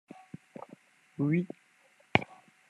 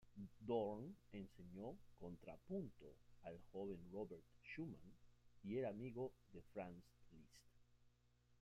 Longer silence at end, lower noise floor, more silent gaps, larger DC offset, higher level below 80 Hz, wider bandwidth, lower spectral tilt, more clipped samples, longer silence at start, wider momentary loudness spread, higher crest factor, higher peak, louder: first, 0.35 s vs 0.05 s; second, -65 dBFS vs -77 dBFS; neither; neither; first, -68 dBFS vs -74 dBFS; second, 10.5 kHz vs 14.5 kHz; about the same, -7 dB/octave vs -8 dB/octave; neither; first, 0.15 s vs 0 s; first, 21 LU vs 15 LU; first, 32 dB vs 22 dB; first, -2 dBFS vs -32 dBFS; first, -31 LUFS vs -53 LUFS